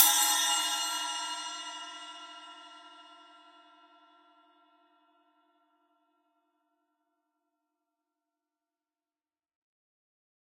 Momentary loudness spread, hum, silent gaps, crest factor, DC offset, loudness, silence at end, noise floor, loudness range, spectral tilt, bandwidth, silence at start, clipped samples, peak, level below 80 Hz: 26 LU; none; none; 34 dB; under 0.1%; -29 LUFS; 7.25 s; under -90 dBFS; 26 LU; 4.5 dB/octave; 16.5 kHz; 0 s; under 0.1%; -2 dBFS; under -90 dBFS